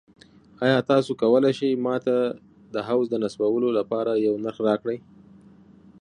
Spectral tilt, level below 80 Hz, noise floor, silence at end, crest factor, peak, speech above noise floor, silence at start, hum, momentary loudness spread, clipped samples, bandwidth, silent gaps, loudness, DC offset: -7 dB/octave; -68 dBFS; -51 dBFS; 1 s; 18 dB; -6 dBFS; 28 dB; 0.6 s; none; 10 LU; under 0.1%; 10.5 kHz; none; -23 LUFS; under 0.1%